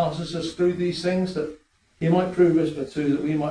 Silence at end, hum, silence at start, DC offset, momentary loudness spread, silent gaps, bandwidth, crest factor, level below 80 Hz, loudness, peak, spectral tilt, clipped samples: 0 s; none; 0 s; under 0.1%; 10 LU; none; 10.5 kHz; 16 dB; -54 dBFS; -24 LUFS; -8 dBFS; -7 dB/octave; under 0.1%